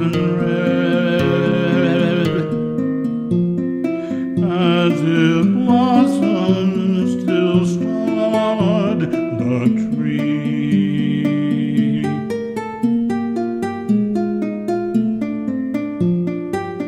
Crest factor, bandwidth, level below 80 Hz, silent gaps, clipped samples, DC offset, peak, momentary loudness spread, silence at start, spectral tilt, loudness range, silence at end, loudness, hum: 16 dB; 11 kHz; -52 dBFS; none; under 0.1%; under 0.1%; -2 dBFS; 7 LU; 0 s; -7.5 dB/octave; 4 LU; 0 s; -18 LUFS; none